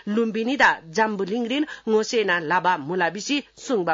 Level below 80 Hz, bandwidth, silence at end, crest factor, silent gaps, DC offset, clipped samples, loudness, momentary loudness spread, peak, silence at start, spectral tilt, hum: -64 dBFS; 7.8 kHz; 0 s; 18 dB; none; under 0.1%; under 0.1%; -22 LUFS; 7 LU; -4 dBFS; 0.05 s; -4 dB/octave; none